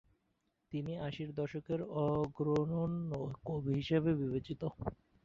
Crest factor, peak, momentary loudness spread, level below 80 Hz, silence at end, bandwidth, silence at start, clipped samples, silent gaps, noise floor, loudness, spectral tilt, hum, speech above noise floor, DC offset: 16 dB; -20 dBFS; 9 LU; -60 dBFS; 0.3 s; 7.2 kHz; 0.7 s; under 0.1%; none; -81 dBFS; -37 LUFS; -7.5 dB/octave; none; 44 dB; under 0.1%